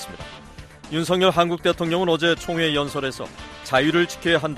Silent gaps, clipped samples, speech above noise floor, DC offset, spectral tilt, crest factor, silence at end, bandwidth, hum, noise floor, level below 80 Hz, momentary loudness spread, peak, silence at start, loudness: none; under 0.1%; 21 dB; under 0.1%; -5 dB/octave; 18 dB; 0 s; 15 kHz; none; -42 dBFS; -48 dBFS; 18 LU; -4 dBFS; 0 s; -21 LUFS